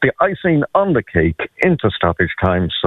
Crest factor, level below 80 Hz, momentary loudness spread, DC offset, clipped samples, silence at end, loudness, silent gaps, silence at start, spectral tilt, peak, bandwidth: 16 dB; -40 dBFS; 2 LU; under 0.1%; under 0.1%; 0 s; -16 LUFS; none; 0 s; -8.5 dB/octave; 0 dBFS; 6.8 kHz